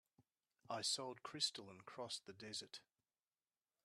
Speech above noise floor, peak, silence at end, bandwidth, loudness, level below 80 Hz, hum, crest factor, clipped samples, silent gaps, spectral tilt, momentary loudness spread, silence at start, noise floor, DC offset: over 41 dB; -28 dBFS; 1.05 s; 13.5 kHz; -46 LUFS; under -90 dBFS; none; 24 dB; under 0.1%; none; -1.5 dB/octave; 15 LU; 0.2 s; under -90 dBFS; under 0.1%